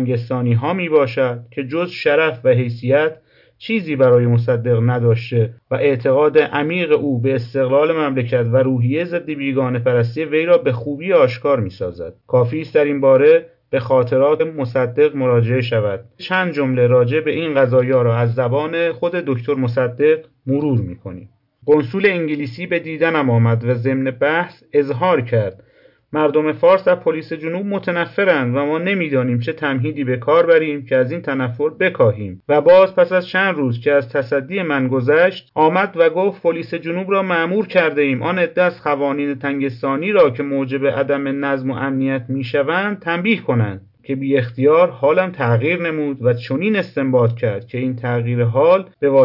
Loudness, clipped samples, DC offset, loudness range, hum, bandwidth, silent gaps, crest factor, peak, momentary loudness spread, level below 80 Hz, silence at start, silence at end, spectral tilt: -17 LUFS; under 0.1%; under 0.1%; 3 LU; none; 5.8 kHz; none; 14 dB; -2 dBFS; 8 LU; -64 dBFS; 0 s; 0 s; -9.5 dB/octave